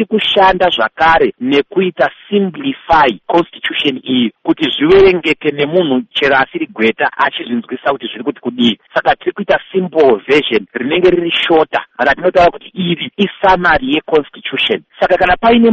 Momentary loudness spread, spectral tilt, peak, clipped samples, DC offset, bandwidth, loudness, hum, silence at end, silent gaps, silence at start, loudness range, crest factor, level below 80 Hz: 8 LU; -6 dB/octave; 0 dBFS; under 0.1%; under 0.1%; 8 kHz; -13 LUFS; none; 0 s; none; 0 s; 3 LU; 12 dB; -40 dBFS